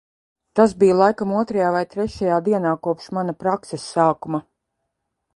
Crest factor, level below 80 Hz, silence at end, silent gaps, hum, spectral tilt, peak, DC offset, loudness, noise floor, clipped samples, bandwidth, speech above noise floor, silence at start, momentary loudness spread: 20 dB; -54 dBFS; 0.95 s; none; none; -6.5 dB/octave; -2 dBFS; under 0.1%; -20 LUFS; -77 dBFS; under 0.1%; 11.5 kHz; 58 dB; 0.55 s; 11 LU